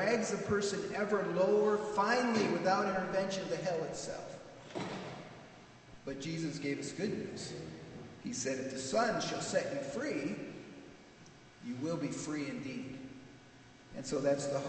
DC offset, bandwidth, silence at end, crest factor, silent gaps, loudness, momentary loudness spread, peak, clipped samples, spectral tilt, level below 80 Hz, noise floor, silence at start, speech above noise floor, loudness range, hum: under 0.1%; 9 kHz; 0 s; 18 dB; none; -36 LUFS; 19 LU; -18 dBFS; under 0.1%; -4.5 dB/octave; -68 dBFS; -58 dBFS; 0 s; 23 dB; 10 LU; none